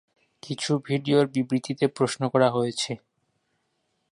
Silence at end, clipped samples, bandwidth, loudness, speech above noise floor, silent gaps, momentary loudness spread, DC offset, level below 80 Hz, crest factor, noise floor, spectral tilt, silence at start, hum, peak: 1.15 s; under 0.1%; 11.5 kHz; -25 LUFS; 50 dB; none; 9 LU; under 0.1%; -70 dBFS; 20 dB; -74 dBFS; -5.5 dB/octave; 0.45 s; none; -6 dBFS